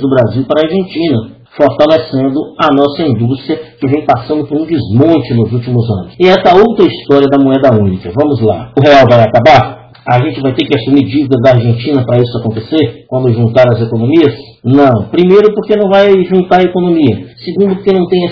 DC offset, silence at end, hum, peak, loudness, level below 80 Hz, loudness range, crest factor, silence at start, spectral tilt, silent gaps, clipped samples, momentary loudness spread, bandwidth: under 0.1%; 0 s; none; 0 dBFS; -9 LUFS; -42 dBFS; 4 LU; 8 dB; 0 s; -8.5 dB/octave; none; 4%; 8 LU; 6 kHz